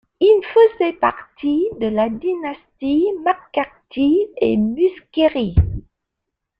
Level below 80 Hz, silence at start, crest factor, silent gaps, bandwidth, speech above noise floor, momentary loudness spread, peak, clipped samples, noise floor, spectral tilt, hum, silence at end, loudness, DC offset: -34 dBFS; 0.2 s; 16 dB; none; 5.2 kHz; 62 dB; 10 LU; -2 dBFS; under 0.1%; -80 dBFS; -9.5 dB/octave; none; 0.8 s; -18 LUFS; under 0.1%